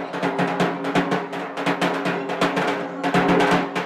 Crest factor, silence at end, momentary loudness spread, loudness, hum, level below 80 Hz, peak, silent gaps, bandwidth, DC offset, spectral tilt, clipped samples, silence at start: 14 dB; 0 s; 7 LU; -22 LUFS; none; -54 dBFS; -8 dBFS; none; 15 kHz; under 0.1%; -5.5 dB/octave; under 0.1%; 0 s